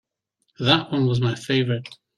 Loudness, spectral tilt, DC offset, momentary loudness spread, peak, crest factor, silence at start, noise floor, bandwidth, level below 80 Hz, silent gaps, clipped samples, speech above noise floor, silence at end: -22 LUFS; -6 dB/octave; under 0.1%; 7 LU; -2 dBFS; 22 dB; 0.6 s; -73 dBFS; 10.5 kHz; -58 dBFS; none; under 0.1%; 52 dB; 0.25 s